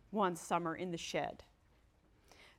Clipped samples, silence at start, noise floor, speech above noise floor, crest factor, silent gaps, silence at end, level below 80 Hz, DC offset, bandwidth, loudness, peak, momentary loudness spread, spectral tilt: under 0.1%; 0.1 s; -70 dBFS; 31 dB; 20 dB; none; 0.1 s; -70 dBFS; under 0.1%; 16.5 kHz; -39 LUFS; -22 dBFS; 8 LU; -4.5 dB/octave